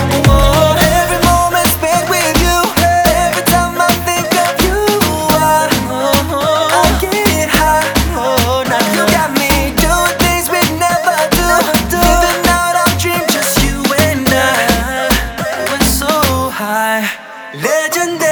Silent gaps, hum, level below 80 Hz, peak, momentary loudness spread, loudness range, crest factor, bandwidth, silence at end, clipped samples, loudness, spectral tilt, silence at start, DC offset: none; none; -22 dBFS; 0 dBFS; 4 LU; 2 LU; 12 dB; over 20 kHz; 0 s; under 0.1%; -12 LUFS; -3.5 dB/octave; 0 s; under 0.1%